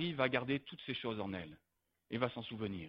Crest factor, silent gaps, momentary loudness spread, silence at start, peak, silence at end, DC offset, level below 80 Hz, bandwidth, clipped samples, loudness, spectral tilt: 22 dB; none; 11 LU; 0 s; -18 dBFS; 0 s; under 0.1%; -70 dBFS; 5.6 kHz; under 0.1%; -40 LUFS; -8.5 dB/octave